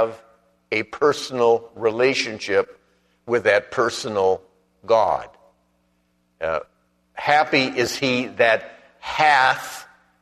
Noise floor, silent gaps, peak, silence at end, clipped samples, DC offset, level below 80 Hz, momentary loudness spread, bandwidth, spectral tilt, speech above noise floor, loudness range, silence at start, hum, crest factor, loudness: -66 dBFS; none; 0 dBFS; 0.4 s; under 0.1%; under 0.1%; -60 dBFS; 11 LU; 13.5 kHz; -3.5 dB/octave; 46 dB; 4 LU; 0 s; 60 Hz at -60 dBFS; 22 dB; -20 LUFS